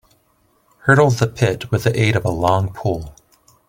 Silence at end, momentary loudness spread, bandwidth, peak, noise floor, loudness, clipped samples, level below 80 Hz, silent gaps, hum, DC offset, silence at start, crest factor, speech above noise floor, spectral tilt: 0.6 s; 10 LU; 16.5 kHz; 0 dBFS; -60 dBFS; -18 LUFS; under 0.1%; -44 dBFS; none; none; under 0.1%; 0.85 s; 18 dB; 44 dB; -6 dB/octave